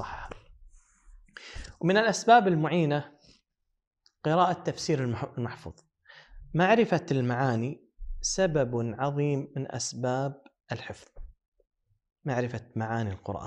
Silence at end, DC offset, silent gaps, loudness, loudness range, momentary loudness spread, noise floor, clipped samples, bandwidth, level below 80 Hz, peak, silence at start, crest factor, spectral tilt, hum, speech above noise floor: 0 s; under 0.1%; 3.87-3.91 s, 11.48-11.52 s; -28 LUFS; 8 LU; 21 LU; -77 dBFS; under 0.1%; 10.5 kHz; -50 dBFS; -6 dBFS; 0 s; 22 dB; -5.5 dB/octave; none; 50 dB